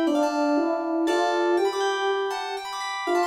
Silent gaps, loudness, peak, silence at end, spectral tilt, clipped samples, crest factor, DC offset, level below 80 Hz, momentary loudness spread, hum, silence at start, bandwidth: none; -24 LUFS; -12 dBFS; 0 s; -2 dB/octave; under 0.1%; 12 dB; under 0.1%; -68 dBFS; 7 LU; none; 0 s; 15 kHz